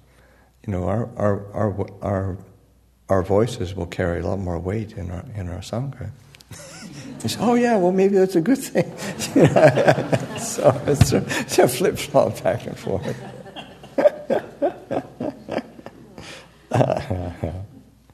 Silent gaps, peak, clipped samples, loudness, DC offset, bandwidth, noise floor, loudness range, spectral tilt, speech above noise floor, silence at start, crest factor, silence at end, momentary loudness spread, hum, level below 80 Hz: none; 0 dBFS; under 0.1%; -21 LUFS; under 0.1%; 13.5 kHz; -56 dBFS; 9 LU; -6 dB/octave; 35 dB; 0.65 s; 22 dB; 0.5 s; 20 LU; none; -46 dBFS